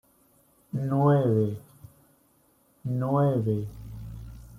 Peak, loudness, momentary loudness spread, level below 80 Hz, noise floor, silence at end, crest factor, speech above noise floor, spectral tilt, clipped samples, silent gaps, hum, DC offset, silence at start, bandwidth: -10 dBFS; -26 LUFS; 19 LU; -52 dBFS; -64 dBFS; 0 s; 18 dB; 40 dB; -10 dB/octave; under 0.1%; none; none; under 0.1%; 0.75 s; 14 kHz